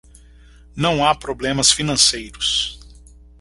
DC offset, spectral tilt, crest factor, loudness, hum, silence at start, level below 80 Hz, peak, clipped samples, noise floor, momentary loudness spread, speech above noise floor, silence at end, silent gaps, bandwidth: under 0.1%; -2 dB/octave; 20 dB; -17 LUFS; none; 0.75 s; -42 dBFS; 0 dBFS; under 0.1%; -46 dBFS; 8 LU; 27 dB; 0.45 s; none; 11.5 kHz